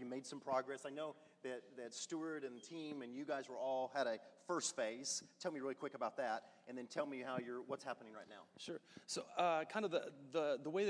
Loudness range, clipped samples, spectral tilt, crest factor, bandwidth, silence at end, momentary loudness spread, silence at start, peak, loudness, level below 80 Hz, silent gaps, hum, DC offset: 4 LU; under 0.1%; -3 dB/octave; 20 dB; 11 kHz; 0 s; 11 LU; 0 s; -24 dBFS; -45 LUFS; under -90 dBFS; none; none; under 0.1%